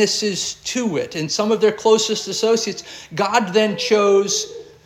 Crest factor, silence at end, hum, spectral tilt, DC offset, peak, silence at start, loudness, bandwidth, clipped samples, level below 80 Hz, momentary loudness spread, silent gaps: 18 dB; 0.2 s; none; -3 dB/octave; under 0.1%; -2 dBFS; 0 s; -18 LUFS; 15.5 kHz; under 0.1%; -62 dBFS; 8 LU; none